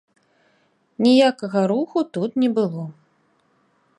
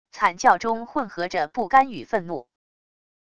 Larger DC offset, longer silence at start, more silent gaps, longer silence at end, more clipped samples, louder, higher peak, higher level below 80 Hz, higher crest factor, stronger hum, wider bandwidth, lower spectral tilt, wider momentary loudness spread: second, under 0.1% vs 0.4%; first, 1 s vs 0.15 s; neither; first, 1.05 s vs 0.8 s; neither; about the same, -20 LUFS vs -22 LUFS; about the same, -4 dBFS vs -4 dBFS; second, -74 dBFS vs -60 dBFS; about the same, 18 dB vs 20 dB; neither; about the same, 10.5 kHz vs 10.5 kHz; first, -6.5 dB/octave vs -4 dB/octave; about the same, 10 LU vs 9 LU